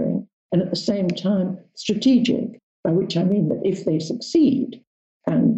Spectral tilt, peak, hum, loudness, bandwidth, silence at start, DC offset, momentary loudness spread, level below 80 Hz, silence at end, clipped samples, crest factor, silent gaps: -7 dB/octave; -8 dBFS; none; -22 LUFS; 8.2 kHz; 0 s; under 0.1%; 10 LU; -60 dBFS; 0 s; under 0.1%; 14 dB; 0.33-0.49 s, 2.63-2.83 s, 4.87-5.21 s